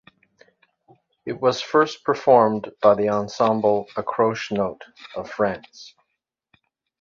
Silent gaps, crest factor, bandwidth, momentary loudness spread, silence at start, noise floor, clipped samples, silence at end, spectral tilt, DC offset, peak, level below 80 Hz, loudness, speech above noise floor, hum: none; 20 dB; 7.4 kHz; 18 LU; 1.25 s; -79 dBFS; under 0.1%; 1.1 s; -5.5 dB/octave; under 0.1%; -2 dBFS; -62 dBFS; -21 LUFS; 58 dB; none